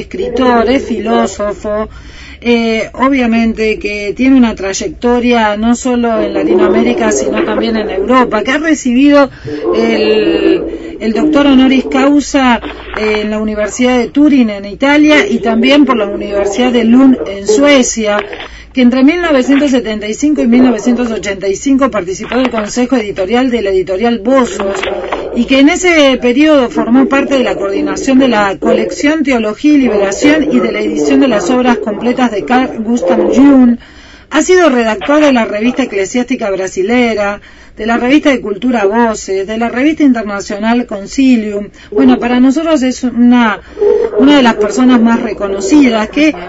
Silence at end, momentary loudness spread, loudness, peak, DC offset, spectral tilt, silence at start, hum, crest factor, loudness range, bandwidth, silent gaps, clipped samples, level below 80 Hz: 0 s; 8 LU; -10 LUFS; 0 dBFS; under 0.1%; -4 dB/octave; 0 s; none; 10 dB; 3 LU; 8 kHz; none; 0.3%; -36 dBFS